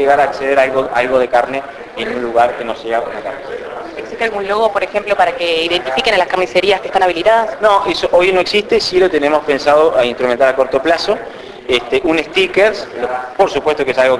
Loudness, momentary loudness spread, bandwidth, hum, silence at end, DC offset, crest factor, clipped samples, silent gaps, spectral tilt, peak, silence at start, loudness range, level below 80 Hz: -14 LUFS; 11 LU; 11 kHz; none; 0 s; under 0.1%; 14 dB; under 0.1%; none; -4 dB/octave; 0 dBFS; 0 s; 5 LU; -46 dBFS